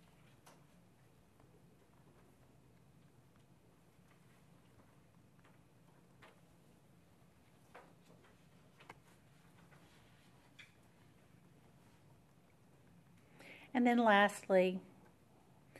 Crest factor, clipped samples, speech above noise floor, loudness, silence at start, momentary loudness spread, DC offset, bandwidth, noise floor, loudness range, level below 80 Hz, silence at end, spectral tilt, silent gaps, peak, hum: 26 dB; under 0.1%; 36 dB; -33 LUFS; 7.75 s; 32 LU; under 0.1%; 13 kHz; -68 dBFS; 29 LU; -80 dBFS; 1 s; -5.5 dB/octave; none; -16 dBFS; none